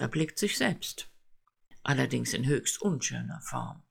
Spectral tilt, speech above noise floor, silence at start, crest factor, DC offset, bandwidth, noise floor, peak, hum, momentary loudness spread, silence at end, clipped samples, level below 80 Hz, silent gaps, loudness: -4 dB/octave; 30 dB; 0 s; 20 dB; under 0.1%; 18 kHz; -61 dBFS; -10 dBFS; none; 10 LU; 0.1 s; under 0.1%; -60 dBFS; none; -31 LUFS